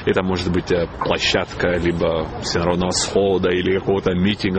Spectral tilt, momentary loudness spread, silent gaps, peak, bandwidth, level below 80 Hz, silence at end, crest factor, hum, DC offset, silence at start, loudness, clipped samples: -4.5 dB/octave; 4 LU; none; -2 dBFS; 8.8 kHz; -38 dBFS; 0 s; 16 dB; none; 0.2%; 0 s; -19 LUFS; under 0.1%